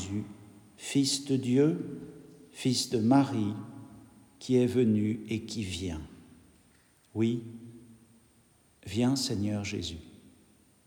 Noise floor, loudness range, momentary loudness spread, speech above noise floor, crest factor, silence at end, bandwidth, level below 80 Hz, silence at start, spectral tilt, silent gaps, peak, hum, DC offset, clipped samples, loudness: -64 dBFS; 8 LU; 21 LU; 35 dB; 18 dB; 0.8 s; 19 kHz; -64 dBFS; 0 s; -5.5 dB/octave; none; -12 dBFS; none; under 0.1%; under 0.1%; -30 LUFS